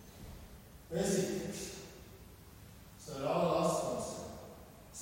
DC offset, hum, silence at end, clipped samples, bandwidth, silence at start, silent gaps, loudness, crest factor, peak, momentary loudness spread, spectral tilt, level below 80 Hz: under 0.1%; none; 0 s; under 0.1%; 16 kHz; 0 s; none; -36 LUFS; 20 dB; -20 dBFS; 23 LU; -5 dB/octave; -60 dBFS